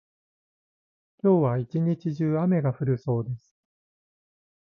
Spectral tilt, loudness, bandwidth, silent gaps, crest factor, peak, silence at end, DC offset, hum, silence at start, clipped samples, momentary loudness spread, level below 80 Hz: -11 dB/octave; -25 LUFS; 6.2 kHz; none; 16 dB; -10 dBFS; 1.35 s; under 0.1%; none; 1.25 s; under 0.1%; 7 LU; -62 dBFS